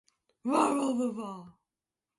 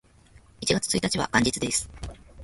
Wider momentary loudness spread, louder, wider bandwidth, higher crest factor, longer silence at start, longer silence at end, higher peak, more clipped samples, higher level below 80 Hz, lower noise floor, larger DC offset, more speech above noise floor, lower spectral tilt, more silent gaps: about the same, 15 LU vs 17 LU; second, -30 LUFS vs -25 LUFS; about the same, 11.5 kHz vs 12 kHz; about the same, 20 dB vs 22 dB; second, 0.45 s vs 0.6 s; first, 0.7 s vs 0 s; second, -12 dBFS vs -6 dBFS; neither; second, -78 dBFS vs -46 dBFS; first, under -90 dBFS vs -55 dBFS; neither; first, over 60 dB vs 29 dB; first, -4.5 dB/octave vs -3 dB/octave; neither